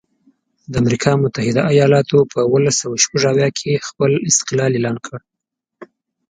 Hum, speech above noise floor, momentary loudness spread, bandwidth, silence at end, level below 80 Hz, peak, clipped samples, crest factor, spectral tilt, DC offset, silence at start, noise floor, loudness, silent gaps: none; 66 dB; 8 LU; 9.6 kHz; 0.45 s; -50 dBFS; 0 dBFS; under 0.1%; 16 dB; -4.5 dB/octave; under 0.1%; 0.7 s; -81 dBFS; -16 LUFS; none